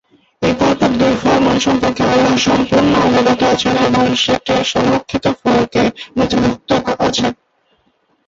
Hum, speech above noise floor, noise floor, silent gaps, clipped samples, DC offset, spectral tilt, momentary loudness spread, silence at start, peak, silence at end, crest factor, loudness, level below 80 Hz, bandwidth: none; 46 dB; -60 dBFS; none; under 0.1%; under 0.1%; -5 dB/octave; 5 LU; 0.4 s; -2 dBFS; 0.95 s; 12 dB; -14 LUFS; -40 dBFS; 7.8 kHz